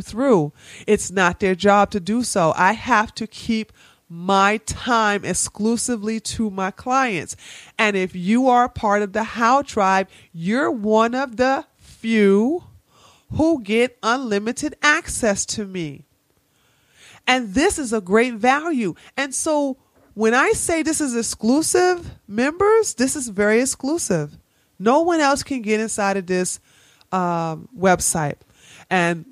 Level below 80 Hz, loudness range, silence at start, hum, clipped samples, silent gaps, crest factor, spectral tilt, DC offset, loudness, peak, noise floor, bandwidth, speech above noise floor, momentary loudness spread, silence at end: -48 dBFS; 3 LU; 0 s; none; under 0.1%; none; 18 dB; -4 dB/octave; under 0.1%; -20 LUFS; -2 dBFS; -63 dBFS; 15.5 kHz; 44 dB; 10 LU; 0.1 s